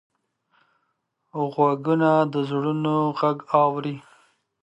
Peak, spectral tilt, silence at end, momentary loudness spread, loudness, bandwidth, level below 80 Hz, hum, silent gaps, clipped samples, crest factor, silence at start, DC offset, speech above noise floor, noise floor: -4 dBFS; -8.5 dB/octave; 0.65 s; 11 LU; -22 LUFS; 8.8 kHz; -74 dBFS; none; none; under 0.1%; 20 dB; 1.35 s; under 0.1%; 53 dB; -74 dBFS